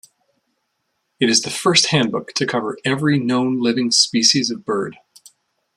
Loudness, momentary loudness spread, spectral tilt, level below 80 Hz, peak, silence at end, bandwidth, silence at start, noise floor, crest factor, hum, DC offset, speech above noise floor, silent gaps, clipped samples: -17 LUFS; 8 LU; -3 dB/octave; -62 dBFS; 0 dBFS; 0.8 s; 13 kHz; 1.2 s; -72 dBFS; 20 dB; none; under 0.1%; 54 dB; none; under 0.1%